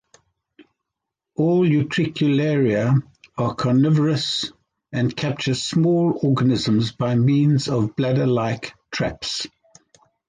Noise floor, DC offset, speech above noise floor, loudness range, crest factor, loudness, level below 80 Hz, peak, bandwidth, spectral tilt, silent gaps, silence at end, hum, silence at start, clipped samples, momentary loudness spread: -83 dBFS; under 0.1%; 64 dB; 2 LU; 12 dB; -20 LUFS; -54 dBFS; -8 dBFS; 9.6 kHz; -6.5 dB/octave; none; 0.8 s; none; 0.6 s; under 0.1%; 9 LU